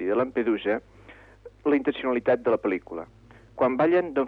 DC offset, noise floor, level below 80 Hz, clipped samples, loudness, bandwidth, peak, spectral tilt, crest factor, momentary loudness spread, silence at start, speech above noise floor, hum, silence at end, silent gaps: under 0.1%; -49 dBFS; -58 dBFS; under 0.1%; -25 LUFS; 5 kHz; -12 dBFS; -8.5 dB/octave; 14 dB; 15 LU; 0 s; 25 dB; 50 Hz at -55 dBFS; 0 s; none